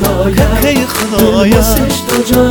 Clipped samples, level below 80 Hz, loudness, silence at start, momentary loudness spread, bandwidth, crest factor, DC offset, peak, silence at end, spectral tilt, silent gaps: 0.2%; -20 dBFS; -10 LUFS; 0 s; 4 LU; over 20 kHz; 10 dB; under 0.1%; 0 dBFS; 0 s; -5 dB/octave; none